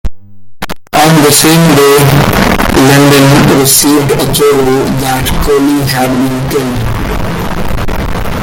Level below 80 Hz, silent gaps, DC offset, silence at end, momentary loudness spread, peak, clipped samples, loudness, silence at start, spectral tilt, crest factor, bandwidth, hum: -22 dBFS; none; under 0.1%; 0 s; 12 LU; 0 dBFS; 0.7%; -7 LUFS; 0.05 s; -4.5 dB/octave; 8 dB; over 20 kHz; none